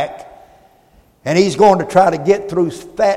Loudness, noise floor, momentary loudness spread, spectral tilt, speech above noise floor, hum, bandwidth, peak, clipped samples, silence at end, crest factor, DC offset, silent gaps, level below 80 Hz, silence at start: -14 LUFS; -51 dBFS; 14 LU; -5.5 dB/octave; 38 dB; none; 13.5 kHz; 0 dBFS; under 0.1%; 0 s; 16 dB; under 0.1%; none; -50 dBFS; 0 s